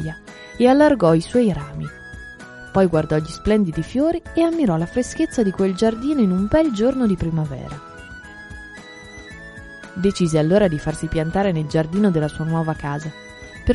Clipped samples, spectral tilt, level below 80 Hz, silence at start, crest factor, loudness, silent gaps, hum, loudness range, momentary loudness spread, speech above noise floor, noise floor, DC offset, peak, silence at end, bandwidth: under 0.1%; -7 dB/octave; -40 dBFS; 0 s; 18 dB; -19 LUFS; none; none; 5 LU; 21 LU; 20 dB; -39 dBFS; under 0.1%; -2 dBFS; 0 s; 11.5 kHz